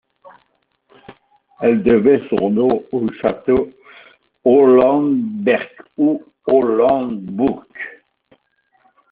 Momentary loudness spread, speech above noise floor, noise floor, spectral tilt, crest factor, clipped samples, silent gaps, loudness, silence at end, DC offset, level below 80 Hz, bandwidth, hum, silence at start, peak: 12 LU; 49 dB; -64 dBFS; -6 dB/octave; 16 dB; under 0.1%; none; -16 LUFS; 1.2 s; under 0.1%; -52 dBFS; 4.4 kHz; none; 1.1 s; -2 dBFS